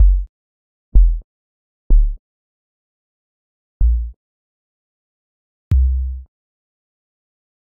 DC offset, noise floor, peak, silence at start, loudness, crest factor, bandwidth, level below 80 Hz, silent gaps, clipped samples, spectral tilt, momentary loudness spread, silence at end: under 0.1%; under -90 dBFS; 0 dBFS; 0 s; -20 LUFS; 18 dB; 0.7 kHz; -18 dBFS; 0.29-0.92 s, 1.24-1.90 s, 2.19-3.80 s, 4.16-5.71 s; under 0.1%; -13.5 dB/octave; 16 LU; 1.4 s